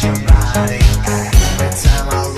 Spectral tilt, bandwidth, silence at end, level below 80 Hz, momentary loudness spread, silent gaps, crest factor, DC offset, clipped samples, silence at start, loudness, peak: -5 dB/octave; 14.5 kHz; 0 s; -14 dBFS; 4 LU; none; 12 dB; under 0.1%; 0.5%; 0 s; -14 LUFS; 0 dBFS